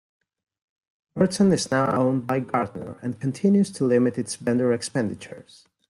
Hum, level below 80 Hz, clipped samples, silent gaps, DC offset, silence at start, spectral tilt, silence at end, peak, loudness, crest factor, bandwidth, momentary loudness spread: none; -62 dBFS; under 0.1%; none; under 0.1%; 1.15 s; -6 dB/octave; 0.45 s; -6 dBFS; -23 LUFS; 18 dB; 12 kHz; 12 LU